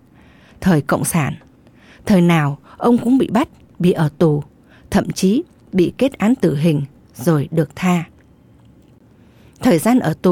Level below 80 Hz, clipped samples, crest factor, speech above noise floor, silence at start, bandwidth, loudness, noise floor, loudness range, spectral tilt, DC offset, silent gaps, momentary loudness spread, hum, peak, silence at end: -46 dBFS; under 0.1%; 12 dB; 33 dB; 0.6 s; 17 kHz; -17 LUFS; -48 dBFS; 3 LU; -6.5 dB/octave; under 0.1%; none; 8 LU; none; -4 dBFS; 0 s